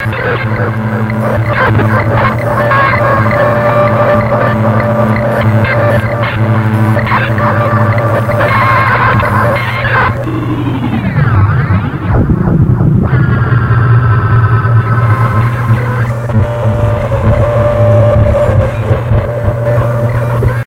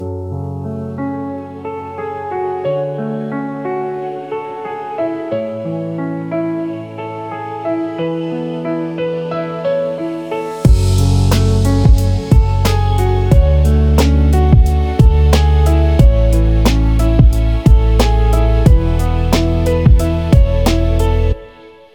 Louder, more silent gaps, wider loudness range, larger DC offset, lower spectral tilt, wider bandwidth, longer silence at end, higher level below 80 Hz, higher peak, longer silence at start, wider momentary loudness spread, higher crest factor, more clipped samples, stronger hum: first, -10 LUFS vs -15 LUFS; neither; second, 2 LU vs 10 LU; second, under 0.1% vs 0.1%; first, -8.5 dB/octave vs -7 dB/octave; second, 6 kHz vs 17.5 kHz; second, 0.05 s vs 0.25 s; second, -24 dBFS vs -16 dBFS; about the same, 0 dBFS vs 0 dBFS; about the same, 0 s vs 0 s; second, 5 LU vs 12 LU; about the same, 10 dB vs 12 dB; neither; neither